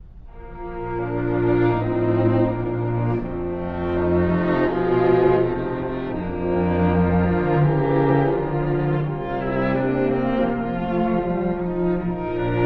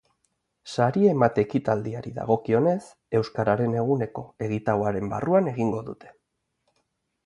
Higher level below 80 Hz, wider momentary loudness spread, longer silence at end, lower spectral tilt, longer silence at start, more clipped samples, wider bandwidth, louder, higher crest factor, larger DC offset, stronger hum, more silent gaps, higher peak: first, -38 dBFS vs -58 dBFS; second, 8 LU vs 12 LU; second, 0 s vs 1.15 s; first, -11 dB/octave vs -8 dB/octave; second, 0 s vs 0.65 s; neither; second, 4.9 kHz vs 11 kHz; first, -21 LUFS vs -25 LUFS; about the same, 16 dB vs 20 dB; neither; neither; neither; about the same, -6 dBFS vs -6 dBFS